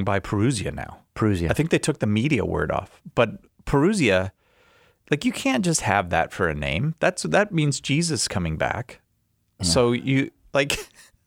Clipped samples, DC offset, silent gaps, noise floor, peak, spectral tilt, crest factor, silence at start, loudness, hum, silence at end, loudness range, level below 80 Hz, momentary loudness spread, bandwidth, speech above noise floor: under 0.1%; under 0.1%; none; -69 dBFS; -4 dBFS; -5 dB/octave; 20 dB; 0 s; -23 LUFS; none; 0.4 s; 2 LU; -44 dBFS; 8 LU; 16.5 kHz; 46 dB